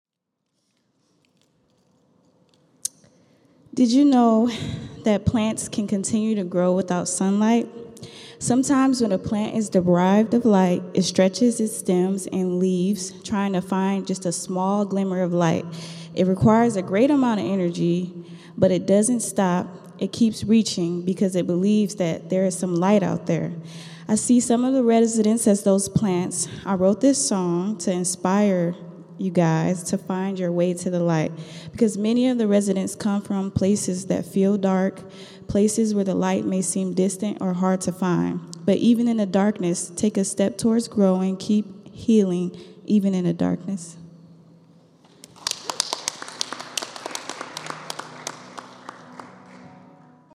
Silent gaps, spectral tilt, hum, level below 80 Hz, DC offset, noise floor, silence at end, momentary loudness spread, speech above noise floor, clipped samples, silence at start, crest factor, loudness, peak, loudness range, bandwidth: none; -5.5 dB/octave; none; -56 dBFS; under 0.1%; -79 dBFS; 0.55 s; 14 LU; 58 dB; under 0.1%; 2.85 s; 20 dB; -22 LUFS; -2 dBFS; 9 LU; 13.5 kHz